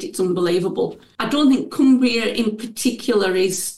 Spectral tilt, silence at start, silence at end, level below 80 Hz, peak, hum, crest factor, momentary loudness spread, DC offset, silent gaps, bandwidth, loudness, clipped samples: -4 dB/octave; 0 s; 0 s; -58 dBFS; -6 dBFS; none; 12 dB; 8 LU; under 0.1%; none; 12.5 kHz; -19 LUFS; under 0.1%